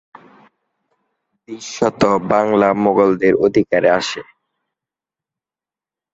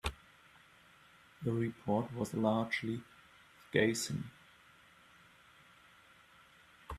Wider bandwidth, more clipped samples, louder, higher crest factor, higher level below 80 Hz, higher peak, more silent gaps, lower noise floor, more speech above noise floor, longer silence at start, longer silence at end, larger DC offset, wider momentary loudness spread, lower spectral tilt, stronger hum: second, 8 kHz vs 15 kHz; neither; first, -15 LUFS vs -36 LUFS; second, 16 dB vs 26 dB; first, -54 dBFS vs -60 dBFS; first, -2 dBFS vs -14 dBFS; neither; first, -90 dBFS vs -63 dBFS; first, 75 dB vs 28 dB; first, 1.5 s vs 0.05 s; first, 1.9 s vs 0 s; neither; about the same, 16 LU vs 17 LU; about the same, -5.5 dB/octave vs -5 dB/octave; neither